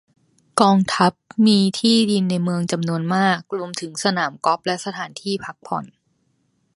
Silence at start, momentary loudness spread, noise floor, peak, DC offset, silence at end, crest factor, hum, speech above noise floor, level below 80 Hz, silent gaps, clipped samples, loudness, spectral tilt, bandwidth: 0.55 s; 12 LU; -66 dBFS; 0 dBFS; under 0.1%; 0.9 s; 20 dB; none; 47 dB; -64 dBFS; none; under 0.1%; -20 LUFS; -5 dB/octave; 11.5 kHz